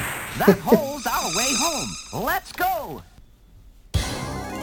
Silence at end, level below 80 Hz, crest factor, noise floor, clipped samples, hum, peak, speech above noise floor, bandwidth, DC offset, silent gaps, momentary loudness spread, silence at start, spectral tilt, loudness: 0 s; -40 dBFS; 22 dB; -49 dBFS; under 0.1%; none; -2 dBFS; 27 dB; 19 kHz; under 0.1%; none; 11 LU; 0 s; -3.5 dB/octave; -23 LUFS